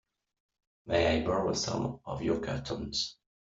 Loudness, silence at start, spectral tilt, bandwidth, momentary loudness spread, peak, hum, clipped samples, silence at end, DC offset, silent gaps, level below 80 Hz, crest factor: -32 LUFS; 0.85 s; -4.5 dB/octave; 8 kHz; 8 LU; -14 dBFS; none; under 0.1%; 0.35 s; under 0.1%; none; -52 dBFS; 20 dB